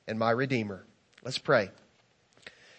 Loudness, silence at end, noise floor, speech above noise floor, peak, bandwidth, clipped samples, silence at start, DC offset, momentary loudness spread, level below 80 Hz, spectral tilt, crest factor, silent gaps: -30 LUFS; 1.1 s; -67 dBFS; 38 dB; -10 dBFS; 8.8 kHz; under 0.1%; 0.05 s; under 0.1%; 21 LU; -76 dBFS; -5.5 dB/octave; 22 dB; none